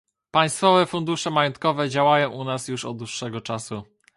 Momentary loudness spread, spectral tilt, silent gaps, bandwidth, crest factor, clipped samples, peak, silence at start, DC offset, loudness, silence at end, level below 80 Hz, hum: 12 LU; -4.5 dB/octave; none; 11.5 kHz; 20 dB; under 0.1%; -4 dBFS; 0.35 s; under 0.1%; -22 LUFS; 0.35 s; -64 dBFS; none